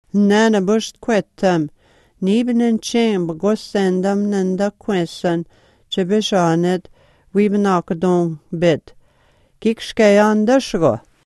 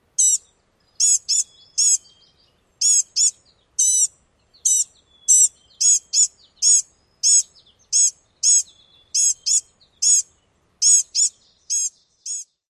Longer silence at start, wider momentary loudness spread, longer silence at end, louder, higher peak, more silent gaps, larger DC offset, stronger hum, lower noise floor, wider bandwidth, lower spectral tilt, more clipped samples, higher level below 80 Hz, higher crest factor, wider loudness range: about the same, 0.15 s vs 0.2 s; second, 9 LU vs 12 LU; about the same, 0.3 s vs 0.25 s; about the same, -17 LUFS vs -16 LUFS; first, 0 dBFS vs -4 dBFS; neither; neither; neither; second, -56 dBFS vs -62 dBFS; second, 12 kHz vs 16 kHz; first, -6 dB/octave vs 5.5 dB/octave; neither; first, -52 dBFS vs -70 dBFS; about the same, 18 dB vs 18 dB; about the same, 2 LU vs 3 LU